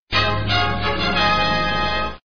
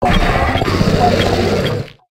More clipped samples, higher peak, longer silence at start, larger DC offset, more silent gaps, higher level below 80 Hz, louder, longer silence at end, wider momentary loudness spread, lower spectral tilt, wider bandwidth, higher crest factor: neither; second, -6 dBFS vs 0 dBFS; about the same, 0 s vs 0 s; first, 3% vs under 0.1%; first, 0.00-0.07 s vs none; second, -34 dBFS vs -22 dBFS; second, -19 LUFS vs -15 LUFS; second, 0.1 s vs 0.25 s; about the same, 4 LU vs 5 LU; second, -2 dB/octave vs -6 dB/octave; second, 6.8 kHz vs 16 kHz; about the same, 14 dB vs 14 dB